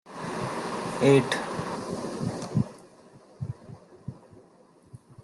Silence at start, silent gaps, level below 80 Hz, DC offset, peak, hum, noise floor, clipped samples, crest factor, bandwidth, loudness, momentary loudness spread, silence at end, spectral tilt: 0.05 s; none; -62 dBFS; under 0.1%; -8 dBFS; none; -57 dBFS; under 0.1%; 22 dB; 12.5 kHz; -28 LUFS; 23 LU; 0 s; -6 dB/octave